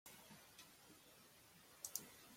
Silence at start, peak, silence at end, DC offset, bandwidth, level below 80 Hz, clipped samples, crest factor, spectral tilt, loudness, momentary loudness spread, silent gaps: 0.05 s; -26 dBFS; 0 s; under 0.1%; 16.5 kHz; -86 dBFS; under 0.1%; 34 dB; -1 dB/octave; -56 LUFS; 15 LU; none